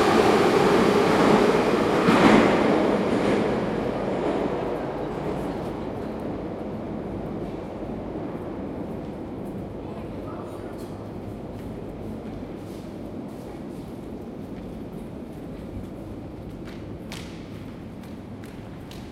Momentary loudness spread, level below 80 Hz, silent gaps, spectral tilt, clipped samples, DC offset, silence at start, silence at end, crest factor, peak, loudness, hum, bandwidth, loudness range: 19 LU; -46 dBFS; none; -6 dB/octave; under 0.1%; under 0.1%; 0 s; 0 s; 22 dB; -4 dBFS; -24 LUFS; none; 15.5 kHz; 17 LU